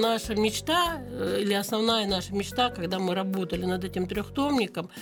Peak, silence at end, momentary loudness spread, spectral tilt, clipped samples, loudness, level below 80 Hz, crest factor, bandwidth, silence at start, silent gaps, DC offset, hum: -10 dBFS; 0 s; 6 LU; -4.5 dB/octave; under 0.1%; -27 LUFS; -50 dBFS; 16 dB; 19.5 kHz; 0 s; none; under 0.1%; none